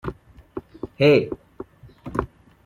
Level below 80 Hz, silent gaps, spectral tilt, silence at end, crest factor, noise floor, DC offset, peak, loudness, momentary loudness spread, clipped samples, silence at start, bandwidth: -46 dBFS; none; -7.5 dB/octave; 0.4 s; 20 dB; -42 dBFS; under 0.1%; -4 dBFS; -21 LUFS; 25 LU; under 0.1%; 0.05 s; 9.8 kHz